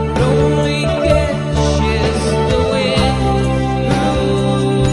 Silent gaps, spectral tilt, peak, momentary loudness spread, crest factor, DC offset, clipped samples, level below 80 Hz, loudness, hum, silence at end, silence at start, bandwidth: none; -6 dB/octave; 0 dBFS; 2 LU; 14 dB; under 0.1%; under 0.1%; -24 dBFS; -15 LUFS; none; 0 s; 0 s; 11.5 kHz